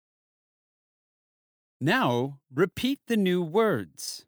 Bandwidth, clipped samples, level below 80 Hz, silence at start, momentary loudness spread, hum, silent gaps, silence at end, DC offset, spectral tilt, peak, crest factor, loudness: over 20 kHz; under 0.1%; -64 dBFS; 1.8 s; 7 LU; none; none; 0.05 s; under 0.1%; -5.5 dB/octave; -10 dBFS; 18 dB; -27 LUFS